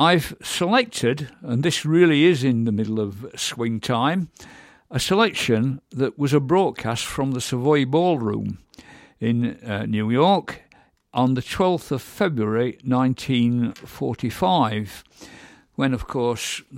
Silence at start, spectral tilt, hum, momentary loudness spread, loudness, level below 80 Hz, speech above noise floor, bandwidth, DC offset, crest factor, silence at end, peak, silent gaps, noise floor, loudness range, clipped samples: 0 s; -5.5 dB/octave; none; 10 LU; -22 LUFS; -52 dBFS; 36 dB; 16.5 kHz; under 0.1%; 18 dB; 0 s; -4 dBFS; none; -57 dBFS; 3 LU; under 0.1%